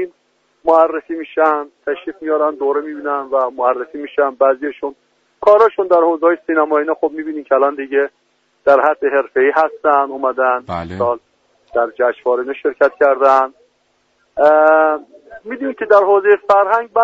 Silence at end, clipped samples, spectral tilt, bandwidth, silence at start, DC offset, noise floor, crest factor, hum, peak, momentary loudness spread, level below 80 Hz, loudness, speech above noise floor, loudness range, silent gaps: 0 s; under 0.1%; -7 dB/octave; 7.2 kHz; 0 s; under 0.1%; -61 dBFS; 16 dB; none; 0 dBFS; 12 LU; -58 dBFS; -15 LUFS; 47 dB; 4 LU; none